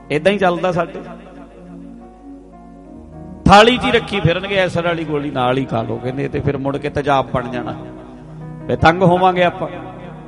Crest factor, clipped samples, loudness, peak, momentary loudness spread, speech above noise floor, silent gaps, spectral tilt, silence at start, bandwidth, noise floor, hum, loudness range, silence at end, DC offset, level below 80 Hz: 18 dB; under 0.1%; -16 LUFS; 0 dBFS; 24 LU; 23 dB; none; -6 dB/octave; 0 s; 11.5 kHz; -39 dBFS; none; 6 LU; 0 s; under 0.1%; -38 dBFS